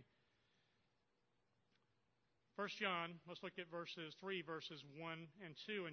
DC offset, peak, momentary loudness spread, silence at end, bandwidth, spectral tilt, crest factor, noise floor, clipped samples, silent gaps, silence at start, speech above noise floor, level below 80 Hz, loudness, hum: under 0.1%; -28 dBFS; 11 LU; 0 s; 6.4 kHz; -2 dB/octave; 24 dB; -85 dBFS; under 0.1%; none; 0 s; 36 dB; under -90 dBFS; -49 LUFS; none